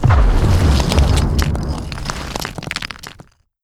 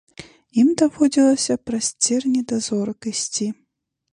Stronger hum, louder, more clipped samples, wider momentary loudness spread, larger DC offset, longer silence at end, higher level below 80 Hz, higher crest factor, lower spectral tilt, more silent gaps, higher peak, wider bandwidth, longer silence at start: neither; about the same, -18 LUFS vs -20 LUFS; neither; about the same, 11 LU vs 9 LU; neither; second, 0.4 s vs 0.6 s; first, -18 dBFS vs -60 dBFS; about the same, 16 dB vs 16 dB; first, -5.5 dB/octave vs -3.5 dB/octave; neither; first, 0 dBFS vs -4 dBFS; first, 15 kHz vs 11 kHz; second, 0 s vs 0.2 s